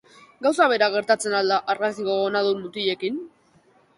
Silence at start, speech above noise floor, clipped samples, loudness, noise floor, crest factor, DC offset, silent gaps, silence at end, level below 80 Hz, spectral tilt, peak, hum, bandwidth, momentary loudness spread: 0.4 s; 37 dB; under 0.1%; -22 LUFS; -59 dBFS; 18 dB; under 0.1%; none; 0.7 s; -70 dBFS; -3.5 dB/octave; -4 dBFS; none; 11.5 kHz; 7 LU